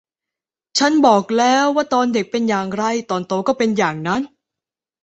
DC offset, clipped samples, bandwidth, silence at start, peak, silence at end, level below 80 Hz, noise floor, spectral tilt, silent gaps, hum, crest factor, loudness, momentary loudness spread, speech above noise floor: under 0.1%; under 0.1%; 8.2 kHz; 0.75 s; -2 dBFS; 0.75 s; -60 dBFS; -88 dBFS; -4.5 dB/octave; none; none; 16 dB; -17 LUFS; 8 LU; 71 dB